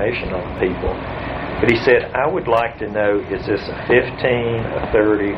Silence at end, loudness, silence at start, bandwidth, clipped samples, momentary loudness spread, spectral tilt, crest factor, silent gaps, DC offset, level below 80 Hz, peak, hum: 0 s; -19 LUFS; 0 s; 7.6 kHz; under 0.1%; 9 LU; -7.5 dB/octave; 18 dB; none; under 0.1%; -36 dBFS; 0 dBFS; none